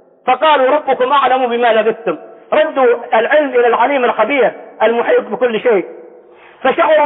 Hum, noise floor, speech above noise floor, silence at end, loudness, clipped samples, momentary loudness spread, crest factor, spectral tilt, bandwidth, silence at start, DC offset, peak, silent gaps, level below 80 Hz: none; -41 dBFS; 28 dB; 0 s; -13 LUFS; under 0.1%; 6 LU; 12 dB; -9 dB/octave; 4 kHz; 0.25 s; under 0.1%; -2 dBFS; none; -66 dBFS